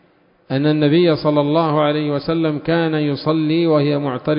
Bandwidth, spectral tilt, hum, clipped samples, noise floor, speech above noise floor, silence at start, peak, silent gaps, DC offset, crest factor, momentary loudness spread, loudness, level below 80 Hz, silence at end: 5.4 kHz; -12 dB/octave; none; under 0.1%; -55 dBFS; 38 dB; 0.5 s; -2 dBFS; none; under 0.1%; 14 dB; 5 LU; -17 LUFS; -54 dBFS; 0 s